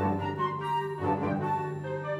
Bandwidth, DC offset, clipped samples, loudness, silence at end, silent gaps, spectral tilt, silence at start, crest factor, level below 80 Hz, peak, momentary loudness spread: 14 kHz; under 0.1%; under 0.1%; -31 LUFS; 0 s; none; -8 dB/octave; 0 s; 14 dB; -64 dBFS; -16 dBFS; 3 LU